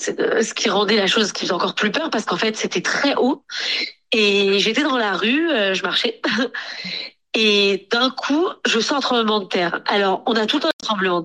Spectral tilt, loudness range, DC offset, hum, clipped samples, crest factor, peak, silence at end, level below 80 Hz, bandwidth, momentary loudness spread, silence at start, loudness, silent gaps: -3 dB/octave; 1 LU; under 0.1%; none; under 0.1%; 16 dB; -4 dBFS; 0 s; -68 dBFS; 12 kHz; 6 LU; 0 s; -19 LUFS; 10.73-10.79 s